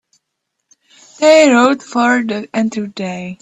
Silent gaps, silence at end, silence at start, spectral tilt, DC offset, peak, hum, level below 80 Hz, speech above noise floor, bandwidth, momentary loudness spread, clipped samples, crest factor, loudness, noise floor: none; 0.05 s; 1.2 s; -4 dB/octave; under 0.1%; 0 dBFS; none; -62 dBFS; 61 dB; 9.6 kHz; 15 LU; under 0.1%; 14 dB; -13 LUFS; -74 dBFS